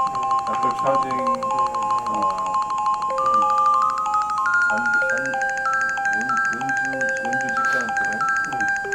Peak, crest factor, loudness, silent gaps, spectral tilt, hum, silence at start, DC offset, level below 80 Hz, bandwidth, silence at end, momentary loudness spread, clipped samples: -8 dBFS; 12 dB; -21 LUFS; none; -3 dB/octave; none; 0 s; under 0.1%; -56 dBFS; 13.5 kHz; 0 s; 4 LU; under 0.1%